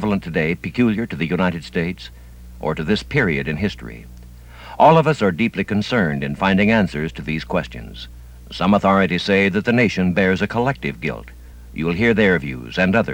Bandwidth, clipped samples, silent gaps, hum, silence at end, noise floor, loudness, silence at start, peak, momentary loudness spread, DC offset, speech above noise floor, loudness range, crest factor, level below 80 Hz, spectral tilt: 16.5 kHz; under 0.1%; none; none; 0 s; -39 dBFS; -19 LUFS; 0 s; -2 dBFS; 19 LU; under 0.1%; 21 dB; 4 LU; 16 dB; -40 dBFS; -7 dB/octave